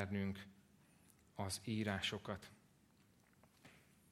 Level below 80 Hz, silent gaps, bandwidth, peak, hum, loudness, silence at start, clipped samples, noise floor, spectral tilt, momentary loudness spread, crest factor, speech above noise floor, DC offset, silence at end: -76 dBFS; none; 15.5 kHz; -24 dBFS; none; -44 LUFS; 0 s; under 0.1%; -72 dBFS; -4.5 dB/octave; 24 LU; 24 dB; 28 dB; under 0.1%; 0.35 s